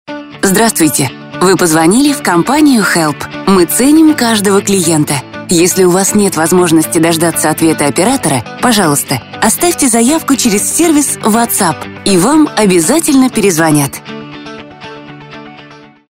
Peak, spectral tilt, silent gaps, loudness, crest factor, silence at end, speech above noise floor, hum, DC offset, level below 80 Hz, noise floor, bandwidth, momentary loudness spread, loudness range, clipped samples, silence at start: 0 dBFS; -4 dB/octave; none; -9 LUFS; 10 dB; 0.3 s; 26 dB; none; under 0.1%; -42 dBFS; -36 dBFS; 16.5 kHz; 15 LU; 2 LU; under 0.1%; 0.1 s